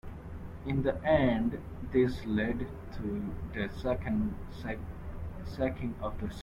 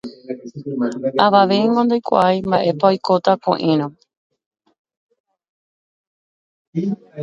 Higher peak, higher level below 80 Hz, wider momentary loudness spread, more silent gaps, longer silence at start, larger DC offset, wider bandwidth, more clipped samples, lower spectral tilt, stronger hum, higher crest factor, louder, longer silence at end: second, -14 dBFS vs 0 dBFS; first, -44 dBFS vs -62 dBFS; about the same, 15 LU vs 15 LU; second, none vs 4.17-4.30 s, 4.46-4.51 s, 4.79-4.85 s, 4.97-5.09 s, 5.20-5.24 s, 5.49-6.73 s; about the same, 0.05 s vs 0.05 s; neither; first, 15 kHz vs 7.8 kHz; neither; about the same, -8 dB/octave vs -7 dB/octave; neither; about the same, 18 dB vs 18 dB; second, -33 LUFS vs -17 LUFS; about the same, 0 s vs 0 s